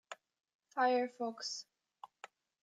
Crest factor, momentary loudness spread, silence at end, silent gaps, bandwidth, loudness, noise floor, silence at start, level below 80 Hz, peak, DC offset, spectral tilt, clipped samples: 18 dB; 24 LU; 0.35 s; 0.54-0.59 s; 9.2 kHz; -37 LUFS; -60 dBFS; 0.1 s; under -90 dBFS; -22 dBFS; under 0.1%; -2 dB/octave; under 0.1%